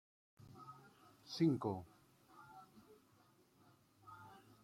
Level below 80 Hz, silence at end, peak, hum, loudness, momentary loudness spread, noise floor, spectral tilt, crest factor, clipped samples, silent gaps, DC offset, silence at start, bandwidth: -82 dBFS; 0.25 s; -24 dBFS; none; -40 LUFS; 27 LU; -72 dBFS; -7 dB/octave; 22 dB; under 0.1%; none; under 0.1%; 0.4 s; 15.5 kHz